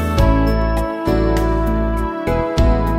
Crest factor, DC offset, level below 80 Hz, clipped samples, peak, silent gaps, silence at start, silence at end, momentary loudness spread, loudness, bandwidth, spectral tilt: 14 dB; under 0.1%; -20 dBFS; under 0.1%; -2 dBFS; none; 0 s; 0 s; 5 LU; -18 LUFS; 15.5 kHz; -7.5 dB/octave